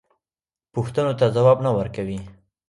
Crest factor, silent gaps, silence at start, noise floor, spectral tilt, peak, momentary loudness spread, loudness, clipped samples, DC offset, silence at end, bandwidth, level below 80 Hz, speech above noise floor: 18 dB; none; 0.75 s; under -90 dBFS; -8 dB/octave; -4 dBFS; 14 LU; -21 LUFS; under 0.1%; under 0.1%; 0.4 s; 11.5 kHz; -50 dBFS; over 70 dB